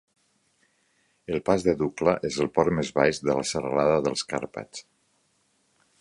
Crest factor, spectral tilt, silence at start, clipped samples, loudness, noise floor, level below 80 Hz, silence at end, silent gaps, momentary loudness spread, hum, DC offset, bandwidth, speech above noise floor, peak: 22 dB; -5 dB/octave; 1.3 s; under 0.1%; -25 LUFS; -69 dBFS; -54 dBFS; 1.2 s; none; 14 LU; none; under 0.1%; 11.5 kHz; 44 dB; -4 dBFS